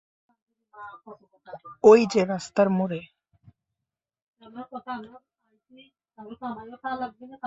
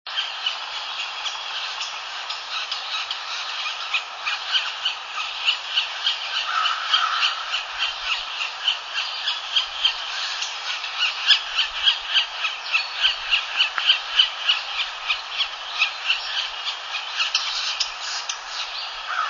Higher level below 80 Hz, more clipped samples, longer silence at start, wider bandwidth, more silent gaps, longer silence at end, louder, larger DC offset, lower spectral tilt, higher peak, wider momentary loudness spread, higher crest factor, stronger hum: second, -70 dBFS vs -62 dBFS; neither; first, 0.8 s vs 0.05 s; about the same, 7.8 kHz vs 7.4 kHz; first, 4.22-4.33 s vs none; about the same, 0 s vs 0 s; about the same, -23 LUFS vs -22 LUFS; neither; first, -6 dB/octave vs 3.5 dB/octave; about the same, -4 dBFS vs -2 dBFS; first, 28 LU vs 9 LU; about the same, 22 dB vs 22 dB; neither